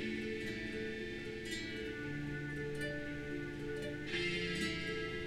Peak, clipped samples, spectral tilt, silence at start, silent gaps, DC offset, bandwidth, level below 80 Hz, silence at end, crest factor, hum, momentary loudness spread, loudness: -26 dBFS; under 0.1%; -5 dB/octave; 0 s; none; under 0.1%; 16 kHz; -56 dBFS; 0 s; 14 dB; none; 6 LU; -41 LUFS